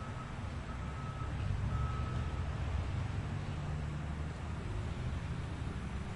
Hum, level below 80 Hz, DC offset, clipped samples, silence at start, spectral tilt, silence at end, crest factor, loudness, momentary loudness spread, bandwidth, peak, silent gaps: none; -44 dBFS; under 0.1%; under 0.1%; 0 s; -7 dB/octave; 0 s; 14 dB; -40 LUFS; 5 LU; 11 kHz; -24 dBFS; none